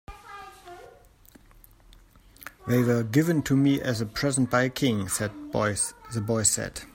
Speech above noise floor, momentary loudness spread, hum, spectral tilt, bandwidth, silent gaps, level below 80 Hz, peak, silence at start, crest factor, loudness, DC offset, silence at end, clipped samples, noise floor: 29 dB; 21 LU; none; -4.5 dB/octave; 16.5 kHz; none; -54 dBFS; -8 dBFS; 0.1 s; 20 dB; -25 LUFS; under 0.1%; 0.1 s; under 0.1%; -54 dBFS